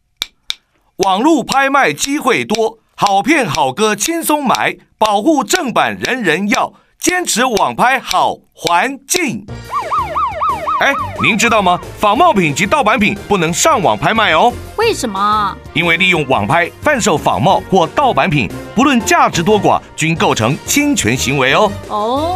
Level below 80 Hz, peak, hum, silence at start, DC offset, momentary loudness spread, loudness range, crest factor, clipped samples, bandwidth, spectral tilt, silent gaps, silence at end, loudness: -40 dBFS; 0 dBFS; none; 0.2 s; under 0.1%; 6 LU; 3 LU; 14 dB; under 0.1%; 15.5 kHz; -3.5 dB/octave; none; 0 s; -13 LUFS